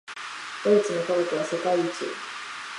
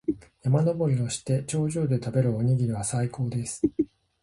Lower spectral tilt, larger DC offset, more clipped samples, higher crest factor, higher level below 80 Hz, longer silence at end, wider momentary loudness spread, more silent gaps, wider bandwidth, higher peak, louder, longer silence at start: second, -4.5 dB/octave vs -7 dB/octave; neither; neither; about the same, 18 dB vs 16 dB; second, -80 dBFS vs -54 dBFS; second, 0 s vs 0.4 s; first, 13 LU vs 6 LU; neither; about the same, 11.5 kHz vs 11.5 kHz; about the same, -8 dBFS vs -10 dBFS; about the same, -26 LUFS vs -27 LUFS; about the same, 0.05 s vs 0.1 s